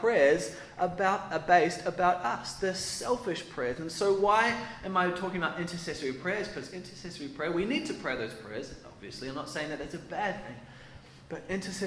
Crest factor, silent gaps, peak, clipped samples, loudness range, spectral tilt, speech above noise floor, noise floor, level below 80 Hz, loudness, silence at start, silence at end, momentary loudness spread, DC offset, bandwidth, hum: 22 dB; none; -8 dBFS; under 0.1%; 9 LU; -4 dB/octave; 20 dB; -51 dBFS; -58 dBFS; -31 LUFS; 0 s; 0 s; 18 LU; under 0.1%; 11 kHz; none